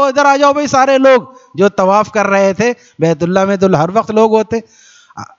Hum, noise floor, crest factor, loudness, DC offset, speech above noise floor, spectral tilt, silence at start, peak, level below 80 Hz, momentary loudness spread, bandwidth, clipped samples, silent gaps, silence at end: none; -33 dBFS; 12 dB; -11 LUFS; under 0.1%; 21 dB; -5.5 dB/octave; 0 s; 0 dBFS; -52 dBFS; 7 LU; 7.6 kHz; under 0.1%; none; 0.15 s